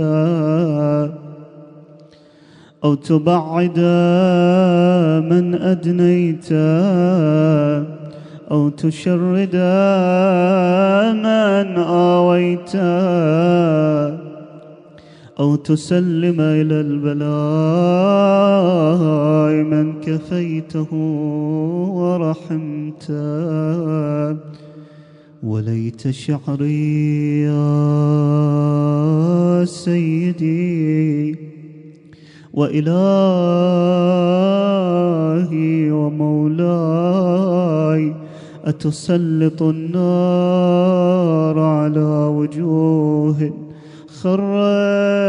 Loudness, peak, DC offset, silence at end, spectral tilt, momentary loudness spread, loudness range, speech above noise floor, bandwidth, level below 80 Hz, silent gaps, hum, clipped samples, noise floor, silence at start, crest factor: -16 LUFS; -2 dBFS; under 0.1%; 0 s; -8.5 dB/octave; 9 LU; 6 LU; 31 dB; 10 kHz; -62 dBFS; none; none; under 0.1%; -46 dBFS; 0 s; 12 dB